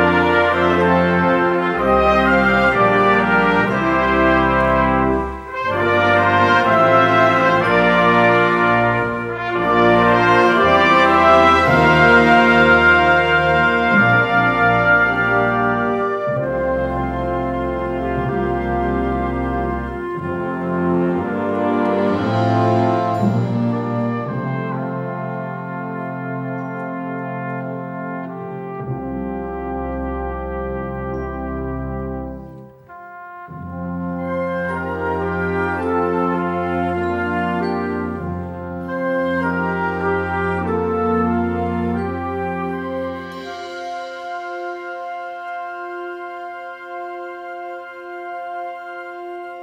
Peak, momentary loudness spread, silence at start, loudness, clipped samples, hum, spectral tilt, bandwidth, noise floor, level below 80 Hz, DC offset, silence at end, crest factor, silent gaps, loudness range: 0 dBFS; 16 LU; 0 s; -17 LUFS; under 0.1%; none; -7 dB/octave; 13 kHz; -39 dBFS; -38 dBFS; under 0.1%; 0 s; 18 dB; none; 15 LU